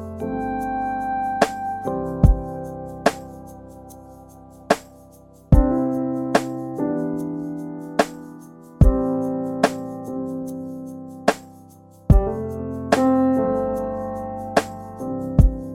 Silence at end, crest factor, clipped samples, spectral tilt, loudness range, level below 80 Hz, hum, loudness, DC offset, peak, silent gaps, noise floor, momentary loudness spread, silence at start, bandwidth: 0 s; 22 dB; under 0.1%; -7 dB/octave; 3 LU; -28 dBFS; none; -23 LUFS; under 0.1%; 0 dBFS; none; -47 dBFS; 17 LU; 0 s; 15 kHz